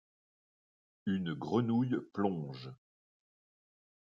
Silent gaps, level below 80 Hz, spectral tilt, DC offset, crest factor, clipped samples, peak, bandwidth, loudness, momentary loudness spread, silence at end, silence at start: none; -78 dBFS; -8.5 dB/octave; under 0.1%; 20 dB; under 0.1%; -18 dBFS; 7 kHz; -35 LUFS; 13 LU; 1.35 s; 1.05 s